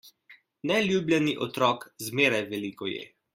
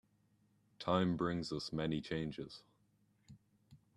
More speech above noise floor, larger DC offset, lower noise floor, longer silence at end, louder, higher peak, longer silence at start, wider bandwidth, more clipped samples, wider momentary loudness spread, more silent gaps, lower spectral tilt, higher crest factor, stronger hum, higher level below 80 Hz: second, 31 dB vs 37 dB; neither; second, -58 dBFS vs -75 dBFS; about the same, 0.3 s vs 0.2 s; first, -27 LUFS vs -39 LUFS; first, -8 dBFS vs -20 dBFS; second, 0.05 s vs 0.8 s; first, 16 kHz vs 11 kHz; neither; second, 11 LU vs 15 LU; neither; second, -4.5 dB/octave vs -6.5 dB/octave; about the same, 20 dB vs 22 dB; neither; about the same, -68 dBFS vs -66 dBFS